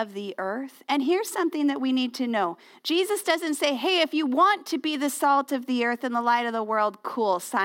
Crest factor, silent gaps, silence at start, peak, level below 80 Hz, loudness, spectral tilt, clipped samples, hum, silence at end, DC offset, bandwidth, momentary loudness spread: 18 dB; none; 0 s; -8 dBFS; -80 dBFS; -25 LUFS; -2.5 dB/octave; under 0.1%; none; 0 s; under 0.1%; 17 kHz; 8 LU